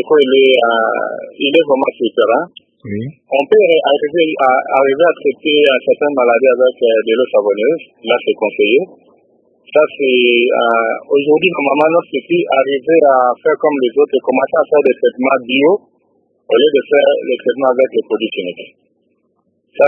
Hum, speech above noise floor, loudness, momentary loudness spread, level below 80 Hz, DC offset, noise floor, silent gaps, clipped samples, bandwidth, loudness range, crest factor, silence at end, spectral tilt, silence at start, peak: none; 49 dB; -13 LUFS; 7 LU; -66 dBFS; under 0.1%; -62 dBFS; none; under 0.1%; 3.6 kHz; 3 LU; 12 dB; 0 s; -7 dB/octave; 0 s; 0 dBFS